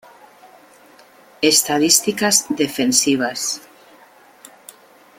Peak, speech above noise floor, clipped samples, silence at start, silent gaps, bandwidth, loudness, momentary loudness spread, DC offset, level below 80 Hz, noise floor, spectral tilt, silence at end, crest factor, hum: 0 dBFS; 31 dB; under 0.1%; 1.4 s; none; 17 kHz; -16 LUFS; 9 LU; under 0.1%; -64 dBFS; -48 dBFS; -1.5 dB/octave; 1.6 s; 20 dB; none